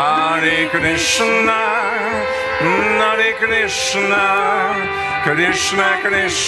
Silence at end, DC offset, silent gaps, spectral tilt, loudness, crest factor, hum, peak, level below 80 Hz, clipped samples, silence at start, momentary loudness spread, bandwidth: 0 s; under 0.1%; none; -2.5 dB/octave; -15 LUFS; 16 dB; none; 0 dBFS; -46 dBFS; under 0.1%; 0 s; 4 LU; 14 kHz